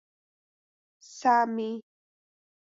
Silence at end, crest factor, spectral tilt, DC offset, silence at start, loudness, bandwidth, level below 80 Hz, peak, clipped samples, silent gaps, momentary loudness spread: 0.9 s; 20 dB; -4.5 dB/octave; under 0.1%; 1.1 s; -27 LUFS; 7.8 kHz; -86 dBFS; -12 dBFS; under 0.1%; none; 18 LU